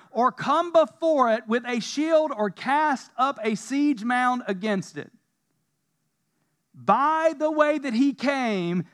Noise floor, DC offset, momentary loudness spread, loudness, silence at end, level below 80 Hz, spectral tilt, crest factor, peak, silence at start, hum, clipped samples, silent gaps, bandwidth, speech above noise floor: -75 dBFS; under 0.1%; 7 LU; -24 LUFS; 0.1 s; -88 dBFS; -5.5 dB/octave; 18 dB; -6 dBFS; 0.15 s; none; under 0.1%; none; 11.5 kHz; 52 dB